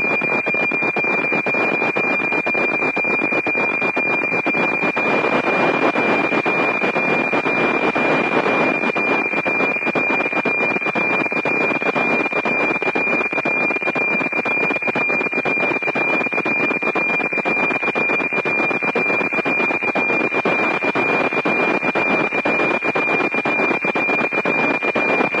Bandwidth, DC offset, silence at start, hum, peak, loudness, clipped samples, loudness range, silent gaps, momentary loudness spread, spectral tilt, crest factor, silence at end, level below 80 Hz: 10.5 kHz; under 0.1%; 0 s; none; -2 dBFS; -17 LUFS; under 0.1%; 1 LU; none; 1 LU; -5.5 dB/octave; 16 dB; 0 s; -66 dBFS